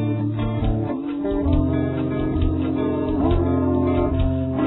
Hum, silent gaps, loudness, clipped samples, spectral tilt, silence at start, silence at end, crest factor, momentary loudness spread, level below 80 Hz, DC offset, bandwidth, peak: none; none; -22 LUFS; under 0.1%; -12.5 dB/octave; 0 s; 0 s; 14 dB; 4 LU; -30 dBFS; under 0.1%; 4.1 kHz; -6 dBFS